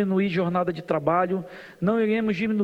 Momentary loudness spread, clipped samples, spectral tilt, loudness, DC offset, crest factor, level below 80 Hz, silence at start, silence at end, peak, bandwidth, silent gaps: 6 LU; under 0.1%; -8.5 dB/octave; -24 LUFS; under 0.1%; 16 dB; -60 dBFS; 0 s; 0 s; -8 dBFS; 7.6 kHz; none